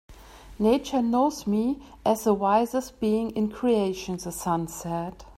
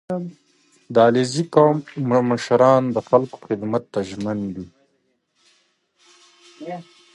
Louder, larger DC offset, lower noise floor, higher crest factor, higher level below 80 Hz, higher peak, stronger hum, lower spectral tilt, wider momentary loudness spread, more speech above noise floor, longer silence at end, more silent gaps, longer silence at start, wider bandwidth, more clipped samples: second, -26 LUFS vs -19 LUFS; neither; second, -46 dBFS vs -68 dBFS; about the same, 16 dB vs 20 dB; first, -52 dBFS vs -60 dBFS; second, -10 dBFS vs 0 dBFS; neither; about the same, -6 dB/octave vs -6.5 dB/octave; second, 9 LU vs 19 LU; second, 21 dB vs 49 dB; second, 0.05 s vs 0.35 s; neither; about the same, 0.1 s vs 0.1 s; first, 16 kHz vs 11.5 kHz; neither